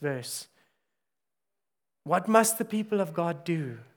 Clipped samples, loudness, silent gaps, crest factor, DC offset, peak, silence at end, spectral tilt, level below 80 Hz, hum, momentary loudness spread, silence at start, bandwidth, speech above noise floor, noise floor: under 0.1%; -28 LUFS; none; 24 dB; under 0.1%; -6 dBFS; 0.15 s; -4.5 dB/octave; -84 dBFS; none; 14 LU; 0 s; over 20 kHz; 62 dB; -90 dBFS